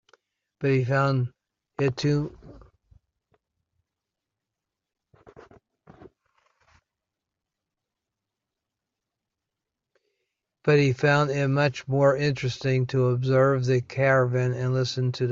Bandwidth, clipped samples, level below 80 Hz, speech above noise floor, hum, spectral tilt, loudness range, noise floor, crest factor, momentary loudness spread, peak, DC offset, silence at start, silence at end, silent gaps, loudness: 7.4 kHz; under 0.1%; -60 dBFS; 63 dB; none; -7 dB/octave; 9 LU; -86 dBFS; 20 dB; 7 LU; -8 dBFS; under 0.1%; 0.6 s; 0 s; none; -24 LUFS